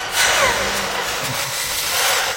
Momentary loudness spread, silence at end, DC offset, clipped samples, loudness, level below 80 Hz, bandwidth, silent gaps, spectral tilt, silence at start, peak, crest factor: 7 LU; 0 s; under 0.1%; under 0.1%; -18 LUFS; -44 dBFS; 16.5 kHz; none; -0.5 dB/octave; 0 s; -2 dBFS; 16 dB